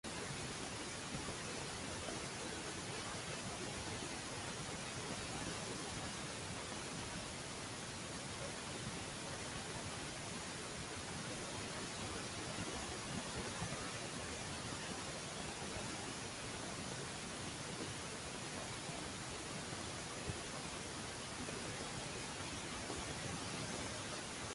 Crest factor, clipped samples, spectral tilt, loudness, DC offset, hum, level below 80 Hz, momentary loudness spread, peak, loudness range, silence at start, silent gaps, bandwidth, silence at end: 18 dB; under 0.1%; -3 dB/octave; -44 LUFS; under 0.1%; none; -60 dBFS; 2 LU; -28 dBFS; 1 LU; 0.05 s; none; 11.5 kHz; 0 s